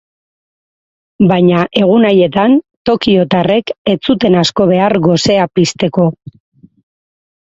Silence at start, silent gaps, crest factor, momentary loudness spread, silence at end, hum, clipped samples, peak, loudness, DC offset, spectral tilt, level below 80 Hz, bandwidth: 1.2 s; 2.77-2.85 s, 3.78-3.85 s; 12 dB; 5 LU; 1.45 s; none; under 0.1%; 0 dBFS; -11 LUFS; under 0.1%; -6 dB/octave; -46 dBFS; 8 kHz